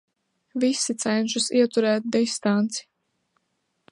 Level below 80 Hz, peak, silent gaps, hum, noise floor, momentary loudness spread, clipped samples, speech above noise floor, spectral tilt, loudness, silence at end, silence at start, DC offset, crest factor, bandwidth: -76 dBFS; -8 dBFS; none; none; -75 dBFS; 6 LU; under 0.1%; 52 dB; -3.5 dB/octave; -23 LUFS; 1.1 s; 0.55 s; under 0.1%; 16 dB; 11.5 kHz